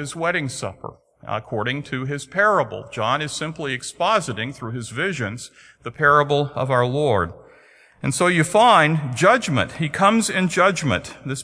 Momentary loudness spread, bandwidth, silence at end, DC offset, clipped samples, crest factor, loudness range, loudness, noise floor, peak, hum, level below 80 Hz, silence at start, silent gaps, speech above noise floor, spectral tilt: 14 LU; 11 kHz; 0 s; under 0.1%; under 0.1%; 20 dB; 6 LU; -20 LUFS; -52 dBFS; -2 dBFS; none; -54 dBFS; 0 s; none; 31 dB; -4.5 dB/octave